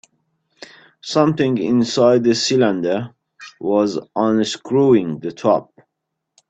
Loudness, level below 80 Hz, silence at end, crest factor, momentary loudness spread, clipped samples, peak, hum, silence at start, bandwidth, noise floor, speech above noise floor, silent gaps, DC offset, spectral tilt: -17 LUFS; -60 dBFS; 0.85 s; 16 dB; 9 LU; under 0.1%; -2 dBFS; none; 1.05 s; 8.6 kHz; -78 dBFS; 61 dB; none; under 0.1%; -5.5 dB/octave